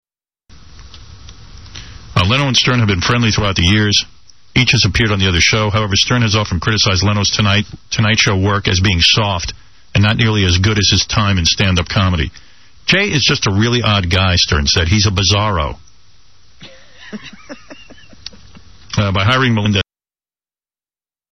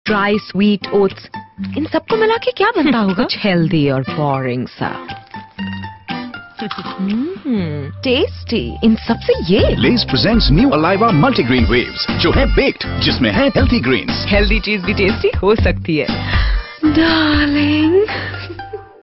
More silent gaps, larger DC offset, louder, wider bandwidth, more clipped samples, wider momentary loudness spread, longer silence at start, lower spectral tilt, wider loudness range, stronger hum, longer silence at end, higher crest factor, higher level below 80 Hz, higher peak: neither; first, 1% vs under 0.1%; about the same, -13 LUFS vs -15 LUFS; first, 8.8 kHz vs 6 kHz; neither; about the same, 13 LU vs 13 LU; first, 0.75 s vs 0.05 s; about the same, -4 dB/octave vs -4.5 dB/octave; about the same, 6 LU vs 8 LU; neither; first, 1.5 s vs 0.15 s; about the same, 14 dB vs 12 dB; second, -32 dBFS vs -26 dBFS; about the same, 0 dBFS vs -2 dBFS